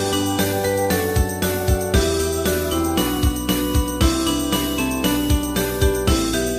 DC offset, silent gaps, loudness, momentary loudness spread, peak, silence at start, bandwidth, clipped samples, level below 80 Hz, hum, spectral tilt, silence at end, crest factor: under 0.1%; none; -20 LUFS; 2 LU; -4 dBFS; 0 s; 15.5 kHz; under 0.1%; -26 dBFS; none; -4.5 dB/octave; 0 s; 16 dB